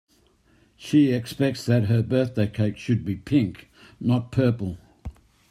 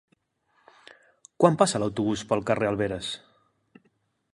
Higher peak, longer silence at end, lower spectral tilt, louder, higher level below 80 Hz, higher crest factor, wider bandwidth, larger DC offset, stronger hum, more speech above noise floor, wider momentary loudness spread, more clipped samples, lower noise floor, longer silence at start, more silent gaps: second, -8 dBFS vs -4 dBFS; second, 0.4 s vs 1.2 s; first, -7.5 dB/octave vs -5 dB/octave; about the same, -24 LUFS vs -25 LUFS; first, -52 dBFS vs -58 dBFS; second, 16 dB vs 24 dB; first, 13.5 kHz vs 11.5 kHz; neither; neither; second, 38 dB vs 46 dB; first, 17 LU vs 12 LU; neither; second, -61 dBFS vs -70 dBFS; second, 0.8 s vs 1.4 s; neither